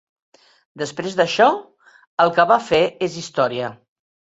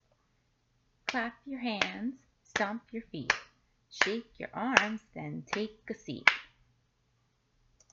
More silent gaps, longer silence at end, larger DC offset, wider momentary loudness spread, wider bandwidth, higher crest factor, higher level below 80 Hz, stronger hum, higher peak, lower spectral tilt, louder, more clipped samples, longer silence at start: first, 2.07-2.17 s vs none; second, 0.6 s vs 1.5 s; neither; about the same, 13 LU vs 15 LU; about the same, 8.2 kHz vs 8 kHz; second, 20 dB vs 36 dB; first, -60 dBFS vs -68 dBFS; neither; about the same, -2 dBFS vs 0 dBFS; first, -4.5 dB/octave vs -3 dB/octave; first, -19 LUFS vs -32 LUFS; neither; second, 0.75 s vs 1.05 s